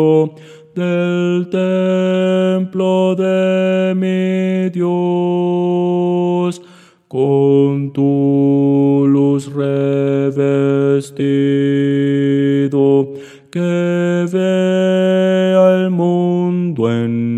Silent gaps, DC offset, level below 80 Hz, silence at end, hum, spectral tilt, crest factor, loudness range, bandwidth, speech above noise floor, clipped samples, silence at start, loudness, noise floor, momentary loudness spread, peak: none; under 0.1%; -74 dBFS; 0 s; none; -8 dB/octave; 14 dB; 2 LU; 10 kHz; 30 dB; under 0.1%; 0 s; -15 LUFS; -44 dBFS; 5 LU; 0 dBFS